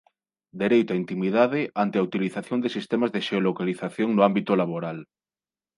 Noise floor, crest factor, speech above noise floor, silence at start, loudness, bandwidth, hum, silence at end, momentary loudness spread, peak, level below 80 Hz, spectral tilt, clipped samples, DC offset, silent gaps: under -90 dBFS; 20 dB; over 66 dB; 0.55 s; -24 LUFS; 11.5 kHz; none; 0.75 s; 8 LU; -4 dBFS; -72 dBFS; -7.5 dB/octave; under 0.1%; under 0.1%; none